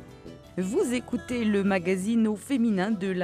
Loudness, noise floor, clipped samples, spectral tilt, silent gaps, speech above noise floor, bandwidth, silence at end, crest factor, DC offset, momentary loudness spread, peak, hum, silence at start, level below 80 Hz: -27 LUFS; -46 dBFS; under 0.1%; -6 dB/octave; none; 20 dB; 14 kHz; 0 s; 14 dB; under 0.1%; 10 LU; -12 dBFS; none; 0 s; -58 dBFS